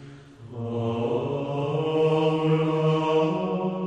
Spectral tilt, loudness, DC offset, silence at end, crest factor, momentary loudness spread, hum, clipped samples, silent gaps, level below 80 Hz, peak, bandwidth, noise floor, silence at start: -8 dB/octave; -25 LUFS; under 0.1%; 0 s; 14 dB; 7 LU; none; under 0.1%; none; -60 dBFS; -10 dBFS; 8.4 kHz; -44 dBFS; 0 s